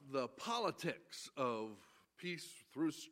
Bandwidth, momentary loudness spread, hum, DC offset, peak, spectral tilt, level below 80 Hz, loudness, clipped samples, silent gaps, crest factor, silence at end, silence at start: 16 kHz; 11 LU; none; under 0.1%; -24 dBFS; -4.5 dB/octave; -90 dBFS; -43 LUFS; under 0.1%; none; 20 dB; 0 s; 0 s